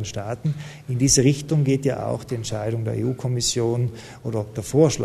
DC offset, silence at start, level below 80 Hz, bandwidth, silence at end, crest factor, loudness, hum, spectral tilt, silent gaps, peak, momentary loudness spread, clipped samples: under 0.1%; 0 s; -48 dBFS; 13.5 kHz; 0 s; 18 dB; -23 LUFS; none; -5 dB/octave; none; -4 dBFS; 11 LU; under 0.1%